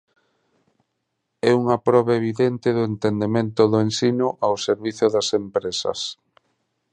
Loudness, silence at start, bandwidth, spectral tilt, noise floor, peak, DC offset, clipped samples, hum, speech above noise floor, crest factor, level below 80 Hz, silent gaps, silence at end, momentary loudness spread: -21 LUFS; 1.45 s; 10 kHz; -5.5 dB/octave; -76 dBFS; -2 dBFS; under 0.1%; under 0.1%; none; 56 dB; 20 dB; -60 dBFS; none; 0.8 s; 6 LU